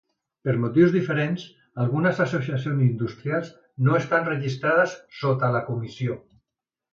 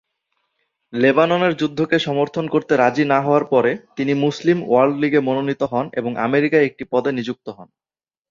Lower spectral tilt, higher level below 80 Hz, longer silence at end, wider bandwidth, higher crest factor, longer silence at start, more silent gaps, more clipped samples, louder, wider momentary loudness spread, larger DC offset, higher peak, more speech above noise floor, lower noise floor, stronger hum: first, -8 dB/octave vs -6.5 dB/octave; about the same, -62 dBFS vs -62 dBFS; about the same, 0.75 s vs 0.65 s; about the same, 7.4 kHz vs 7.4 kHz; about the same, 18 dB vs 18 dB; second, 0.45 s vs 0.9 s; neither; neither; second, -24 LUFS vs -18 LUFS; first, 11 LU vs 8 LU; neither; second, -6 dBFS vs -2 dBFS; first, 64 dB vs 54 dB; first, -87 dBFS vs -72 dBFS; neither